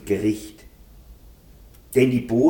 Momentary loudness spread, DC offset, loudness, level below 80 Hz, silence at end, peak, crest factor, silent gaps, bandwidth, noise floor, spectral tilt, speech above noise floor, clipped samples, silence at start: 13 LU; under 0.1%; -22 LUFS; -48 dBFS; 0 s; -6 dBFS; 18 dB; none; 19 kHz; -48 dBFS; -7 dB/octave; 28 dB; under 0.1%; 0.05 s